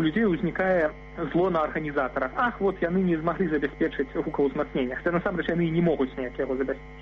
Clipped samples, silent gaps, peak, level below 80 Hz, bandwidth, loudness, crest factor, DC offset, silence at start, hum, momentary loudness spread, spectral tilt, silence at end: under 0.1%; none; -12 dBFS; -46 dBFS; 6.2 kHz; -26 LUFS; 14 dB; under 0.1%; 0 s; none; 5 LU; -6 dB/octave; 0 s